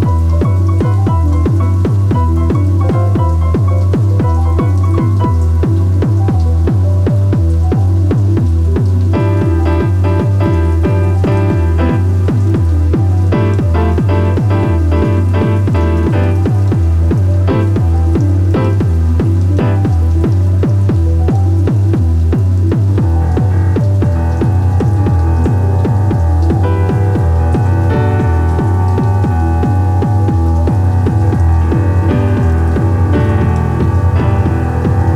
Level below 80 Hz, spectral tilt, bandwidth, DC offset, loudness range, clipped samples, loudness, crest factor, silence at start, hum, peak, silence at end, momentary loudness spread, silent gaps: -20 dBFS; -9 dB/octave; 6.6 kHz; under 0.1%; 0 LU; under 0.1%; -12 LUFS; 10 dB; 0 s; none; 0 dBFS; 0 s; 1 LU; none